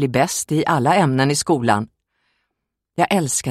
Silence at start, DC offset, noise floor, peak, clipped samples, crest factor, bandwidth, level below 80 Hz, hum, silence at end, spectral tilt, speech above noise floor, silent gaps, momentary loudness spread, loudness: 0 s; under 0.1%; -79 dBFS; -2 dBFS; under 0.1%; 18 dB; 16 kHz; -56 dBFS; none; 0 s; -4.5 dB/octave; 61 dB; none; 6 LU; -18 LUFS